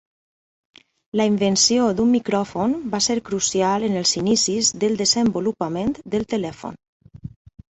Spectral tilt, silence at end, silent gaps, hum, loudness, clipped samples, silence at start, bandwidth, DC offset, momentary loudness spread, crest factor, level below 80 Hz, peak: -3.5 dB/octave; 0.5 s; 6.88-7.00 s; none; -20 LUFS; under 0.1%; 1.15 s; 8.2 kHz; under 0.1%; 14 LU; 16 dB; -54 dBFS; -6 dBFS